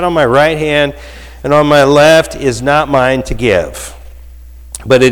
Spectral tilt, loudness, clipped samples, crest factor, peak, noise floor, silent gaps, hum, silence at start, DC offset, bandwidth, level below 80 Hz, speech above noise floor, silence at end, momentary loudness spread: -5 dB/octave; -10 LUFS; under 0.1%; 10 dB; 0 dBFS; -32 dBFS; none; none; 0 s; under 0.1%; 18 kHz; -30 dBFS; 22 dB; 0 s; 19 LU